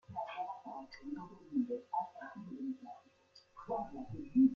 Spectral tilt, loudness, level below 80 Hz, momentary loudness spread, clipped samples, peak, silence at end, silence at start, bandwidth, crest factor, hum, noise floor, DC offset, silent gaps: -8 dB/octave; -41 LUFS; -70 dBFS; 12 LU; under 0.1%; -20 dBFS; 0 s; 0.1 s; 6 kHz; 20 dB; none; -66 dBFS; under 0.1%; none